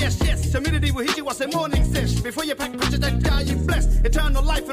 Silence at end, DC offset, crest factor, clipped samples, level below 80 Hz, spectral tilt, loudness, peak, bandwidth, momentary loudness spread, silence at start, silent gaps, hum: 0 s; under 0.1%; 10 dB; under 0.1%; -22 dBFS; -5 dB/octave; -22 LUFS; -10 dBFS; 16 kHz; 3 LU; 0 s; none; none